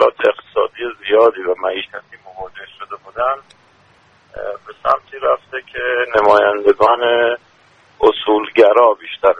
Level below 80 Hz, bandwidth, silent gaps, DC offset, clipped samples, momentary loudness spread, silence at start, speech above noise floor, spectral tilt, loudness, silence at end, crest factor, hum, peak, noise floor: -52 dBFS; 7.6 kHz; none; under 0.1%; under 0.1%; 18 LU; 0 s; 38 dB; -5 dB/octave; -15 LUFS; 0 s; 16 dB; none; 0 dBFS; -51 dBFS